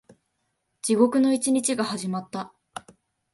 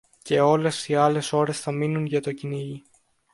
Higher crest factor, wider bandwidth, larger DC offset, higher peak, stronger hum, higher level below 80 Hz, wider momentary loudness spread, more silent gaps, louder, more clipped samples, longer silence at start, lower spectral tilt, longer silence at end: about the same, 20 dB vs 18 dB; about the same, 12 kHz vs 11.5 kHz; neither; about the same, -6 dBFS vs -6 dBFS; neither; second, -72 dBFS vs -66 dBFS; first, 21 LU vs 12 LU; neither; about the same, -23 LUFS vs -24 LUFS; neither; first, 0.85 s vs 0.25 s; second, -4 dB/octave vs -5.5 dB/octave; about the same, 0.55 s vs 0.55 s